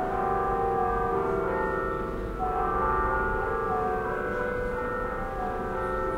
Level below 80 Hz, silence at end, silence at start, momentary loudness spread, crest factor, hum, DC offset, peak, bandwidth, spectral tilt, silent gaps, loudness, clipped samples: -38 dBFS; 0 s; 0 s; 5 LU; 14 dB; none; under 0.1%; -14 dBFS; 16 kHz; -7.5 dB/octave; none; -28 LUFS; under 0.1%